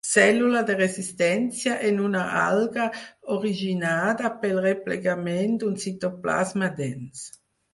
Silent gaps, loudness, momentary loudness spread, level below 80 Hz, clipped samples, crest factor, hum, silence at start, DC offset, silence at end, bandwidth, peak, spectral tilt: none; -24 LUFS; 8 LU; -66 dBFS; under 0.1%; 20 dB; none; 0.05 s; under 0.1%; 0.45 s; 11.5 kHz; -4 dBFS; -4.5 dB/octave